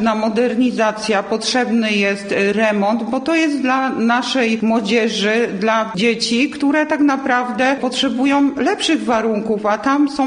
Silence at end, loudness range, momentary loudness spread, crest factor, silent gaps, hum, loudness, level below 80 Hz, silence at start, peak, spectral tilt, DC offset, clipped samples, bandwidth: 0 s; 1 LU; 2 LU; 14 dB; none; none; -16 LUFS; -56 dBFS; 0 s; -2 dBFS; -4 dB/octave; under 0.1%; under 0.1%; 10 kHz